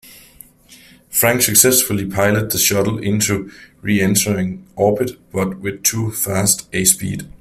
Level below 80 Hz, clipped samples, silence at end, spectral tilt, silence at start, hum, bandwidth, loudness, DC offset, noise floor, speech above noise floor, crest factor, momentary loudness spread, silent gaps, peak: -48 dBFS; under 0.1%; 0.1 s; -3.5 dB/octave; 0.05 s; none; 16 kHz; -16 LUFS; under 0.1%; -46 dBFS; 29 dB; 18 dB; 11 LU; none; 0 dBFS